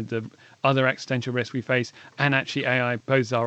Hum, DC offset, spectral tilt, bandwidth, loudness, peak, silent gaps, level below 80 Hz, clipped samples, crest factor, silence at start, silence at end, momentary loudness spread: none; under 0.1%; -6 dB/octave; 8.4 kHz; -24 LUFS; -6 dBFS; none; -74 dBFS; under 0.1%; 20 dB; 0 s; 0 s; 10 LU